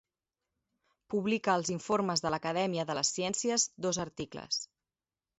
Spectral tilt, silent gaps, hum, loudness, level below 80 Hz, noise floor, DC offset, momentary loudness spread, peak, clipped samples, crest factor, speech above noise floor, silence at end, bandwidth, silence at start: -3.5 dB/octave; none; none; -32 LUFS; -68 dBFS; under -90 dBFS; under 0.1%; 6 LU; -14 dBFS; under 0.1%; 20 dB; over 58 dB; 0.75 s; 8 kHz; 1.1 s